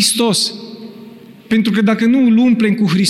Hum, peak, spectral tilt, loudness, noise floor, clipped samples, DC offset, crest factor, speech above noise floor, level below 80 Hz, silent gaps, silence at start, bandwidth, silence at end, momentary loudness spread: none; -4 dBFS; -4 dB/octave; -13 LUFS; -37 dBFS; under 0.1%; under 0.1%; 10 dB; 25 dB; -60 dBFS; none; 0 s; 15.5 kHz; 0 s; 20 LU